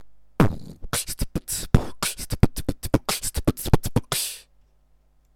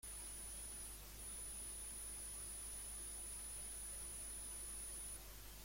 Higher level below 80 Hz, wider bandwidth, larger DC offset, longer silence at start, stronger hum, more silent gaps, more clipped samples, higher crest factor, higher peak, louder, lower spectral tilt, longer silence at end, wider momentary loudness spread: first, -32 dBFS vs -58 dBFS; about the same, 18 kHz vs 16.5 kHz; neither; about the same, 0 s vs 0.05 s; second, none vs 50 Hz at -60 dBFS; neither; neither; first, 24 dB vs 12 dB; first, 0 dBFS vs -40 dBFS; first, -25 LUFS vs -48 LUFS; first, -4.5 dB/octave vs -1 dB/octave; first, 0.95 s vs 0 s; first, 7 LU vs 3 LU